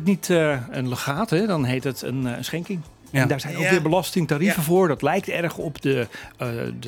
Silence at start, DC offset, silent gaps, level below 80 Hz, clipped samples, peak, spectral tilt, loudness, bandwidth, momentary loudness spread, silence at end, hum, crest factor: 0 s; under 0.1%; none; -54 dBFS; under 0.1%; -4 dBFS; -5.5 dB/octave; -23 LUFS; 19 kHz; 9 LU; 0 s; none; 18 dB